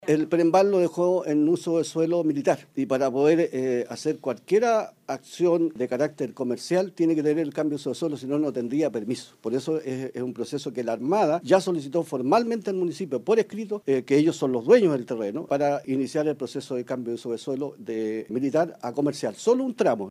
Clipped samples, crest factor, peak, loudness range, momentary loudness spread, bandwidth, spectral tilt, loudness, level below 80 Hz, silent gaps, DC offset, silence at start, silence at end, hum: under 0.1%; 20 dB; -6 dBFS; 5 LU; 10 LU; 13.5 kHz; -6 dB/octave; -25 LUFS; -76 dBFS; none; under 0.1%; 0 s; 0 s; none